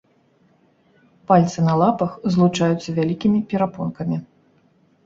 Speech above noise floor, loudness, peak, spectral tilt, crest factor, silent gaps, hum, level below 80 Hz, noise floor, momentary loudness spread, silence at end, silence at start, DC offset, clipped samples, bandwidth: 40 dB; -20 LUFS; -2 dBFS; -7.5 dB/octave; 18 dB; none; none; -56 dBFS; -59 dBFS; 9 LU; 0.8 s; 1.3 s; under 0.1%; under 0.1%; 7.6 kHz